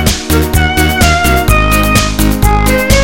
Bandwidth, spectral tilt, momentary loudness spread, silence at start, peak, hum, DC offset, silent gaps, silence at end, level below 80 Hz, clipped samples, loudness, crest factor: 17.5 kHz; -4.5 dB/octave; 2 LU; 0 s; 0 dBFS; none; 3%; none; 0 s; -14 dBFS; 0.3%; -10 LUFS; 10 dB